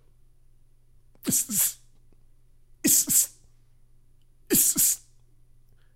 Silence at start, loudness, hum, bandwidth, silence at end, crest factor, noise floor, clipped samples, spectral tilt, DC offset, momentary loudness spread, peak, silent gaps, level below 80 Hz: 1.25 s; -22 LUFS; none; 16 kHz; 1 s; 22 dB; -55 dBFS; under 0.1%; -1.5 dB/octave; under 0.1%; 10 LU; -6 dBFS; none; -56 dBFS